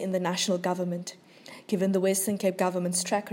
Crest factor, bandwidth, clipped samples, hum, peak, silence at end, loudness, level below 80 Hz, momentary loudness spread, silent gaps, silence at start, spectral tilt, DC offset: 16 dB; 16.5 kHz; under 0.1%; none; -12 dBFS; 0 s; -28 LUFS; -80 dBFS; 12 LU; none; 0 s; -4.5 dB/octave; under 0.1%